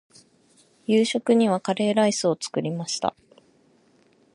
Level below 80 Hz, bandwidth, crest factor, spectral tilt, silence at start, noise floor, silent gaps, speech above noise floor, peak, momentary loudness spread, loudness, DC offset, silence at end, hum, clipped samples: -72 dBFS; 11 kHz; 20 dB; -4.5 dB/octave; 0.9 s; -60 dBFS; none; 38 dB; -6 dBFS; 8 LU; -23 LUFS; under 0.1%; 1.25 s; none; under 0.1%